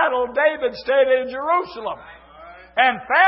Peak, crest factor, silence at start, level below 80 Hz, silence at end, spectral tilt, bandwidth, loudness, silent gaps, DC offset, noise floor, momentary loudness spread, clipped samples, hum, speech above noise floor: -2 dBFS; 18 dB; 0 s; -58 dBFS; 0 s; -7 dB/octave; 5.8 kHz; -20 LUFS; none; under 0.1%; -43 dBFS; 13 LU; under 0.1%; none; 24 dB